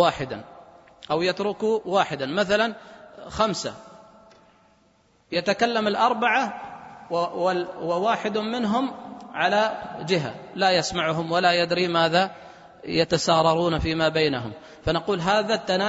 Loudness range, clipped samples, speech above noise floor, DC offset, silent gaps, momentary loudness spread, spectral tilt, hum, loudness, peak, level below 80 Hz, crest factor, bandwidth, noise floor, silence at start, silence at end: 5 LU; under 0.1%; 38 dB; under 0.1%; none; 13 LU; -4.5 dB/octave; none; -23 LUFS; -4 dBFS; -50 dBFS; 20 dB; 8 kHz; -61 dBFS; 0 s; 0 s